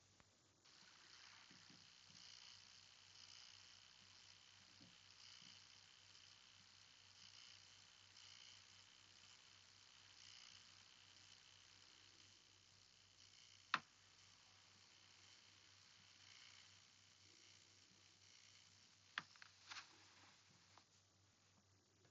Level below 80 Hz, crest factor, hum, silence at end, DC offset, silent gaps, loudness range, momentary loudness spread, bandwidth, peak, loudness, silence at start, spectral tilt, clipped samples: under -90 dBFS; 42 dB; none; 0 s; under 0.1%; none; 10 LU; 10 LU; 8 kHz; -22 dBFS; -61 LUFS; 0 s; 0.5 dB/octave; under 0.1%